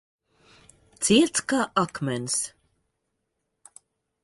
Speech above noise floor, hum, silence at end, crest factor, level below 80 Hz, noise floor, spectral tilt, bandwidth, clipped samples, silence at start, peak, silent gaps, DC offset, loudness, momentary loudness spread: 55 dB; none; 1.75 s; 22 dB; -64 dBFS; -79 dBFS; -3.5 dB/octave; 11.5 kHz; under 0.1%; 1 s; -6 dBFS; none; under 0.1%; -24 LUFS; 9 LU